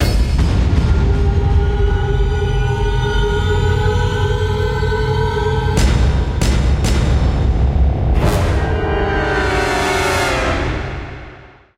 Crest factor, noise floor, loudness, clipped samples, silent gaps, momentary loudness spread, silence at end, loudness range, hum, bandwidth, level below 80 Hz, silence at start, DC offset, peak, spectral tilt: 12 dB; -39 dBFS; -16 LUFS; under 0.1%; none; 2 LU; 0.3 s; 1 LU; none; 15.5 kHz; -18 dBFS; 0 s; under 0.1%; -2 dBFS; -6 dB/octave